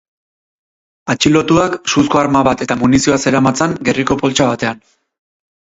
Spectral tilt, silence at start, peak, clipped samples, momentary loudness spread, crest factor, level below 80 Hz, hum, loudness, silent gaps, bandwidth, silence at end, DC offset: -4.5 dB/octave; 1.05 s; 0 dBFS; under 0.1%; 8 LU; 14 dB; -42 dBFS; none; -13 LUFS; none; 8 kHz; 1 s; under 0.1%